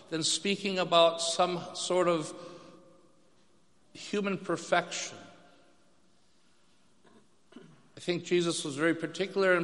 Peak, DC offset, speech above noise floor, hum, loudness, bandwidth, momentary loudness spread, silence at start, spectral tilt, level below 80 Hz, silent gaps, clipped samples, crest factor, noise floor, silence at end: -10 dBFS; under 0.1%; 39 dB; none; -30 LUFS; 11.5 kHz; 15 LU; 0.1 s; -3.5 dB/octave; -80 dBFS; none; under 0.1%; 24 dB; -68 dBFS; 0 s